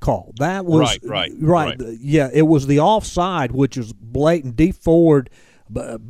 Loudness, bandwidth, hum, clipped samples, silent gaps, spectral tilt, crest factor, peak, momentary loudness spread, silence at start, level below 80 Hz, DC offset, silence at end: -17 LUFS; 13.5 kHz; none; under 0.1%; none; -6.5 dB/octave; 14 dB; -2 dBFS; 11 LU; 0 s; -36 dBFS; under 0.1%; 0 s